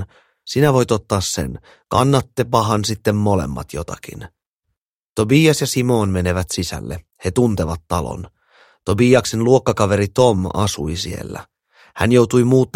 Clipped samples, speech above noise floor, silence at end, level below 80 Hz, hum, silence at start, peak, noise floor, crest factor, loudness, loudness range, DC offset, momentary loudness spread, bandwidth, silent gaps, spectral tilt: under 0.1%; 59 dB; 0.1 s; -40 dBFS; none; 0 s; 0 dBFS; -76 dBFS; 18 dB; -17 LUFS; 3 LU; under 0.1%; 16 LU; 16.5 kHz; 4.47-4.60 s, 4.78-5.16 s; -5.5 dB/octave